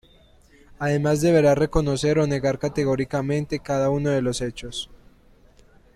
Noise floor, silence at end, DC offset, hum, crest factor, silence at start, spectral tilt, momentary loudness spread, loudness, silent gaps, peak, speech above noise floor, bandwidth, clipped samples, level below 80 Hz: -54 dBFS; 1 s; under 0.1%; none; 18 dB; 0.8 s; -6 dB/octave; 12 LU; -22 LUFS; none; -6 dBFS; 32 dB; 14 kHz; under 0.1%; -42 dBFS